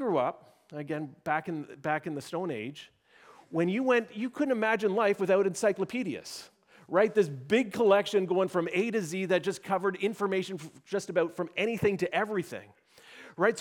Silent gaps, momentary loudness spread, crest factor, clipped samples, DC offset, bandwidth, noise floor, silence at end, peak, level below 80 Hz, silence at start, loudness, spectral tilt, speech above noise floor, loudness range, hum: none; 13 LU; 20 dB; under 0.1%; under 0.1%; 16.5 kHz; -57 dBFS; 0 s; -10 dBFS; -74 dBFS; 0 s; -29 LUFS; -5.5 dB/octave; 28 dB; 5 LU; none